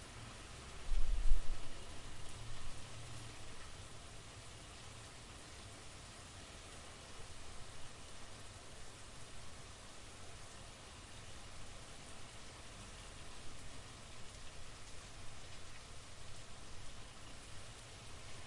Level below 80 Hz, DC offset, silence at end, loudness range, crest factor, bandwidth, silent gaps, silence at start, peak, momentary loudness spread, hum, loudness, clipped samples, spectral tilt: -46 dBFS; under 0.1%; 0 s; 6 LU; 24 dB; 11.5 kHz; none; 0 s; -16 dBFS; 3 LU; none; -52 LUFS; under 0.1%; -3 dB/octave